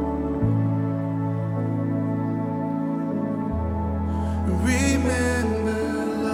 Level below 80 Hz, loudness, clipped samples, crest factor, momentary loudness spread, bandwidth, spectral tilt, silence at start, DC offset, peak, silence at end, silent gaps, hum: -38 dBFS; -24 LUFS; under 0.1%; 14 dB; 5 LU; 15 kHz; -6.5 dB/octave; 0 s; under 0.1%; -10 dBFS; 0 s; none; none